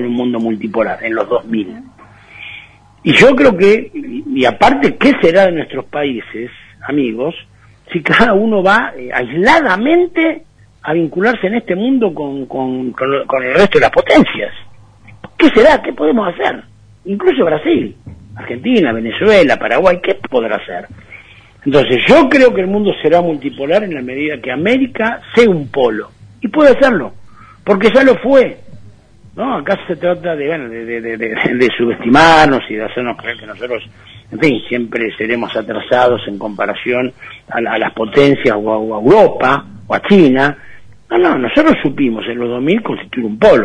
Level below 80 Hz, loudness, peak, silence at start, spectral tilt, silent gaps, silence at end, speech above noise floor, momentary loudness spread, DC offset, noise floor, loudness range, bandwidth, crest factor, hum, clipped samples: -42 dBFS; -12 LUFS; 0 dBFS; 0 s; -6 dB/octave; none; 0 s; 28 dB; 14 LU; under 0.1%; -40 dBFS; 5 LU; 10.5 kHz; 12 dB; none; 0.2%